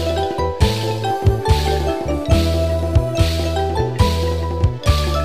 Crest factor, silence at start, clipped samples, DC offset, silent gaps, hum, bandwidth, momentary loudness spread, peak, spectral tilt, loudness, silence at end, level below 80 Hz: 14 dB; 0 s; under 0.1%; 1%; none; none; 15 kHz; 4 LU; -4 dBFS; -6 dB/octave; -18 LUFS; 0 s; -22 dBFS